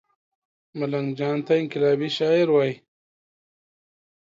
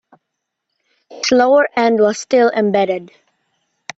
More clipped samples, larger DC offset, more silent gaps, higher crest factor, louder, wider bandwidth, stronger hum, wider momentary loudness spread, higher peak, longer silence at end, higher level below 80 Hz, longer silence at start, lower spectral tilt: neither; neither; neither; about the same, 16 dB vs 16 dB; second, -23 LUFS vs -14 LUFS; about the same, 7.6 kHz vs 8 kHz; neither; about the same, 11 LU vs 10 LU; second, -8 dBFS vs 0 dBFS; first, 1.5 s vs 0.9 s; second, -72 dBFS vs -62 dBFS; second, 0.75 s vs 1.1 s; first, -7 dB/octave vs -4 dB/octave